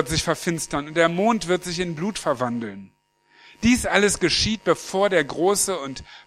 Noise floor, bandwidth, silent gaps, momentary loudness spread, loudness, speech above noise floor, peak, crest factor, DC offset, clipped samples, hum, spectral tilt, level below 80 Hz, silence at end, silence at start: -57 dBFS; 15.5 kHz; none; 8 LU; -22 LUFS; 34 dB; 0 dBFS; 22 dB; under 0.1%; under 0.1%; none; -3.5 dB/octave; -44 dBFS; 0.1 s; 0 s